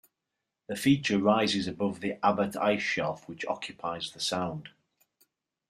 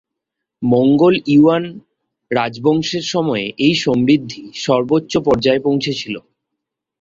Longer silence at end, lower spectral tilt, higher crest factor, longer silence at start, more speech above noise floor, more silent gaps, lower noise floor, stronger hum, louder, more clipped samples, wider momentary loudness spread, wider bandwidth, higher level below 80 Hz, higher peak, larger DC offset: first, 1 s vs 0.8 s; about the same, -5 dB/octave vs -6 dB/octave; first, 20 dB vs 14 dB; about the same, 0.7 s vs 0.6 s; second, 57 dB vs 65 dB; neither; first, -86 dBFS vs -80 dBFS; neither; second, -29 LUFS vs -16 LUFS; neither; about the same, 11 LU vs 12 LU; first, 15 kHz vs 7.6 kHz; second, -68 dBFS vs -50 dBFS; second, -10 dBFS vs -2 dBFS; neither